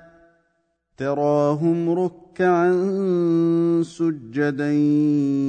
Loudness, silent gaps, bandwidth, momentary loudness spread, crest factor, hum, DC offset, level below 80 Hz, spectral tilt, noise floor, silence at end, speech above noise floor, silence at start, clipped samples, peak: -21 LUFS; none; 9 kHz; 6 LU; 12 dB; none; under 0.1%; -66 dBFS; -8.5 dB/octave; -70 dBFS; 0 s; 50 dB; 1 s; under 0.1%; -8 dBFS